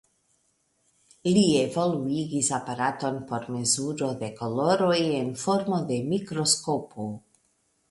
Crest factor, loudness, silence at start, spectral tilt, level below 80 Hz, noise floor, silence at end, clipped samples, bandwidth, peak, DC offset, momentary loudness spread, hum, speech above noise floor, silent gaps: 20 dB; -26 LUFS; 1.25 s; -4.5 dB/octave; -64 dBFS; -71 dBFS; 0.7 s; under 0.1%; 11.5 kHz; -8 dBFS; under 0.1%; 10 LU; none; 45 dB; none